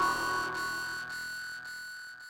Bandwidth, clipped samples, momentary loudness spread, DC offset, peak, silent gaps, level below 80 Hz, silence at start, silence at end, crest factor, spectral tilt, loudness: 16.5 kHz; under 0.1%; 10 LU; under 0.1%; -18 dBFS; none; -62 dBFS; 0 s; 0 s; 16 dB; -1.5 dB/octave; -35 LUFS